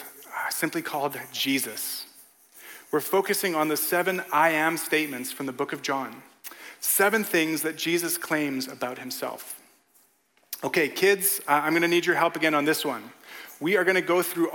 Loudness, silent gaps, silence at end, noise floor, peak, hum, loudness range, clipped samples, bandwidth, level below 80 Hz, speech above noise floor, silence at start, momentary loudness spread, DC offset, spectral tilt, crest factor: -25 LUFS; none; 0 s; -65 dBFS; -6 dBFS; none; 5 LU; under 0.1%; 17.5 kHz; -80 dBFS; 39 dB; 0 s; 17 LU; under 0.1%; -3 dB/octave; 20 dB